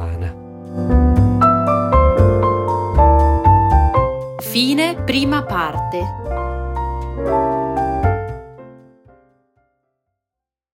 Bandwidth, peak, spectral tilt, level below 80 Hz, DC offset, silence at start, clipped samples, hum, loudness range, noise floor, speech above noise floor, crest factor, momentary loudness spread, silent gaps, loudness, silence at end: 16.5 kHz; 0 dBFS; -7 dB/octave; -24 dBFS; under 0.1%; 0 s; under 0.1%; none; 9 LU; -85 dBFS; 68 dB; 16 dB; 12 LU; none; -16 LUFS; 2 s